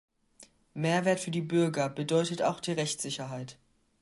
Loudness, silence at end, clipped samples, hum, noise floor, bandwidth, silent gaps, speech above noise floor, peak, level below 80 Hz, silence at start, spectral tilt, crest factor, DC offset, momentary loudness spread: -30 LUFS; 0.5 s; under 0.1%; none; -59 dBFS; 11.5 kHz; none; 30 dB; -14 dBFS; -72 dBFS; 0.4 s; -5 dB/octave; 18 dB; under 0.1%; 12 LU